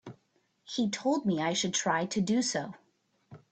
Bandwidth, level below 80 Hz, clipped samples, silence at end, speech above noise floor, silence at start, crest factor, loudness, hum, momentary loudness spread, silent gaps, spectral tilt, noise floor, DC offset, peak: 9 kHz; -72 dBFS; under 0.1%; 0.15 s; 43 dB; 0.05 s; 18 dB; -30 LUFS; none; 9 LU; none; -4 dB/octave; -73 dBFS; under 0.1%; -14 dBFS